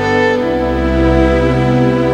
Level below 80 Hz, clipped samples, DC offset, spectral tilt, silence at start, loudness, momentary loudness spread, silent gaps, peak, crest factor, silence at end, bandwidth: -22 dBFS; under 0.1%; under 0.1%; -7.5 dB/octave; 0 s; -13 LUFS; 3 LU; none; 0 dBFS; 12 dB; 0 s; 9.6 kHz